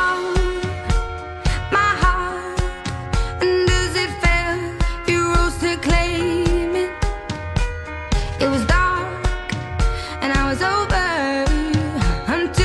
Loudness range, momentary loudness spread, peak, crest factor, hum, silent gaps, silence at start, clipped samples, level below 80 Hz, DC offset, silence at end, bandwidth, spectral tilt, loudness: 2 LU; 8 LU; -4 dBFS; 16 dB; none; none; 0 s; under 0.1%; -24 dBFS; under 0.1%; 0 s; 12 kHz; -5 dB/octave; -20 LUFS